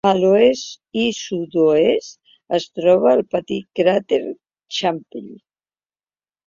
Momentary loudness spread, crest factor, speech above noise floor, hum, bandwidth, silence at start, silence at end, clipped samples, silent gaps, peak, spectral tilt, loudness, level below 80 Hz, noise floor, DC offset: 15 LU; 18 dB; over 72 dB; none; 7.6 kHz; 0.05 s; 1.1 s; under 0.1%; none; -2 dBFS; -5 dB/octave; -18 LUFS; -60 dBFS; under -90 dBFS; under 0.1%